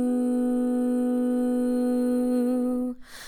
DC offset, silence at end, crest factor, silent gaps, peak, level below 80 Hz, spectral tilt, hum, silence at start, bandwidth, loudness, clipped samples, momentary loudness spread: under 0.1%; 0 s; 8 dB; none; -16 dBFS; -56 dBFS; -5.5 dB/octave; none; 0 s; 14 kHz; -25 LUFS; under 0.1%; 2 LU